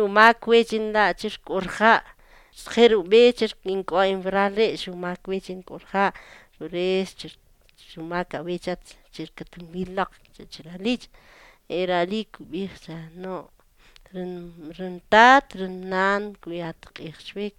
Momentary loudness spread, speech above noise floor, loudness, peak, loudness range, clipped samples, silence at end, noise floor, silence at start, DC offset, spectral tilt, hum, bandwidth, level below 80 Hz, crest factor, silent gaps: 23 LU; 31 dB; -22 LUFS; 0 dBFS; 12 LU; under 0.1%; 0.1 s; -54 dBFS; 0 s; under 0.1%; -5 dB/octave; none; 13 kHz; -54 dBFS; 24 dB; none